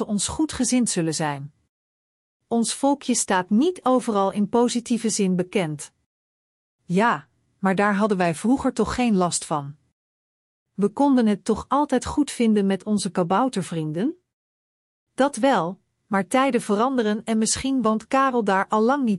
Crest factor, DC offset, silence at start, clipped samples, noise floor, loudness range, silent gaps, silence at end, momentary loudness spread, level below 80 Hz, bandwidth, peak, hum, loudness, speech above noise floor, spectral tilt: 16 dB; under 0.1%; 0 s; under 0.1%; under -90 dBFS; 3 LU; 1.69-2.40 s, 6.06-6.79 s, 9.92-10.66 s, 14.33-15.07 s; 0 s; 7 LU; -52 dBFS; 12 kHz; -8 dBFS; none; -22 LUFS; over 68 dB; -4.5 dB/octave